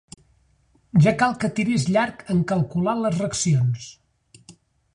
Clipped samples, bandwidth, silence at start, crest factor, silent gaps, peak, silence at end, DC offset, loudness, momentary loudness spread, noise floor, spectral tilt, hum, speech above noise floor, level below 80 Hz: under 0.1%; 10.5 kHz; 0.95 s; 18 dB; none; -6 dBFS; 0.45 s; under 0.1%; -22 LUFS; 6 LU; -61 dBFS; -6 dB/octave; none; 41 dB; -54 dBFS